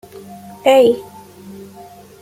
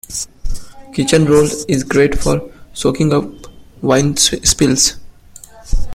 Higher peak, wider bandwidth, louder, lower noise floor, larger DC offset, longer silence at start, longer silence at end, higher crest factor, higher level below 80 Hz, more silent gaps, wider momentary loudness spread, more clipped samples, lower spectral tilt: about the same, -2 dBFS vs 0 dBFS; about the same, 16 kHz vs 16.5 kHz; about the same, -14 LUFS vs -14 LUFS; about the same, -39 dBFS vs -39 dBFS; neither; first, 0.3 s vs 0.1 s; first, 0.6 s vs 0 s; about the same, 16 dB vs 16 dB; second, -60 dBFS vs -26 dBFS; neither; first, 26 LU vs 16 LU; neither; about the same, -4.5 dB/octave vs -4 dB/octave